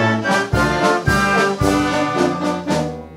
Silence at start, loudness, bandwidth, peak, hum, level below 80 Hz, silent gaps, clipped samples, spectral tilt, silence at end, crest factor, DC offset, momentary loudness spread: 0 s; -17 LUFS; 16 kHz; -2 dBFS; none; -34 dBFS; none; under 0.1%; -5 dB/octave; 0 s; 16 dB; under 0.1%; 5 LU